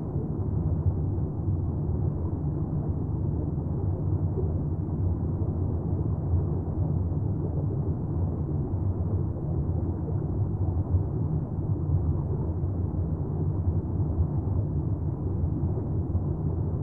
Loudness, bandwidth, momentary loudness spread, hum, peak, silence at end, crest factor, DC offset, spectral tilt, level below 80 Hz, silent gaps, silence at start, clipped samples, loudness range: -29 LUFS; 1.8 kHz; 2 LU; none; -14 dBFS; 0 s; 14 dB; 0.3%; -14.5 dB/octave; -36 dBFS; none; 0 s; under 0.1%; 1 LU